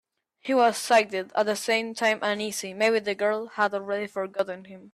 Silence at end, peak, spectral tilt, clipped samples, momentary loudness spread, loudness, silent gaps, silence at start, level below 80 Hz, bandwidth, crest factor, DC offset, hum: 0.05 s; -8 dBFS; -3 dB/octave; under 0.1%; 9 LU; -25 LUFS; none; 0.45 s; -76 dBFS; 14.5 kHz; 18 dB; under 0.1%; none